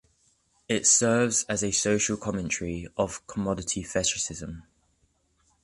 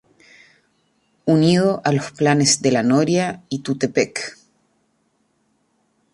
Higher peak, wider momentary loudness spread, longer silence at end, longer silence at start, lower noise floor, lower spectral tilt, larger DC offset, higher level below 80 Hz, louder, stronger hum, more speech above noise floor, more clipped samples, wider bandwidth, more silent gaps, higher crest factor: second, -8 dBFS vs -2 dBFS; about the same, 12 LU vs 11 LU; second, 1 s vs 1.85 s; second, 0.7 s vs 1.25 s; about the same, -69 dBFS vs -66 dBFS; second, -3 dB/octave vs -4.5 dB/octave; neither; first, -52 dBFS vs -60 dBFS; second, -26 LUFS vs -18 LUFS; neither; second, 42 dB vs 48 dB; neither; about the same, 11.5 kHz vs 11.5 kHz; neither; about the same, 20 dB vs 18 dB